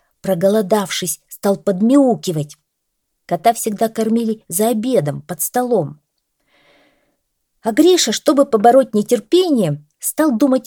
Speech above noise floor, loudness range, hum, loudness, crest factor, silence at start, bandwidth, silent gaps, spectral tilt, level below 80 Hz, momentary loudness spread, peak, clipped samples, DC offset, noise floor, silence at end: 57 dB; 5 LU; none; -16 LUFS; 16 dB; 0.25 s; 19.5 kHz; none; -4.5 dB/octave; -64 dBFS; 10 LU; 0 dBFS; under 0.1%; under 0.1%; -73 dBFS; 0.05 s